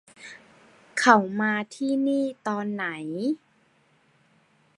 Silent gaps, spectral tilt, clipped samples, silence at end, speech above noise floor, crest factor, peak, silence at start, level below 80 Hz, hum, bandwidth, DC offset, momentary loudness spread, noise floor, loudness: none; -4.5 dB/octave; under 0.1%; 1.4 s; 39 dB; 26 dB; -2 dBFS; 0.2 s; -76 dBFS; none; 11.5 kHz; under 0.1%; 16 LU; -64 dBFS; -25 LUFS